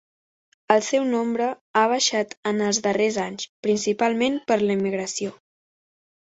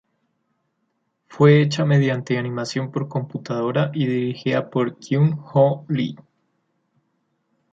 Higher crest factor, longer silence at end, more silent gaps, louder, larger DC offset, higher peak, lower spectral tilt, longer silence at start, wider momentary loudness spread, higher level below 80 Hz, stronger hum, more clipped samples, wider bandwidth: about the same, 22 dB vs 18 dB; second, 1.05 s vs 1.6 s; first, 1.61-1.74 s, 2.37-2.43 s, 3.49-3.63 s vs none; about the same, -23 LUFS vs -21 LUFS; neither; about the same, -2 dBFS vs -4 dBFS; second, -3.5 dB/octave vs -7.5 dB/octave; second, 0.7 s vs 1.3 s; about the same, 8 LU vs 10 LU; about the same, -66 dBFS vs -64 dBFS; neither; neither; about the same, 8.2 kHz vs 7.8 kHz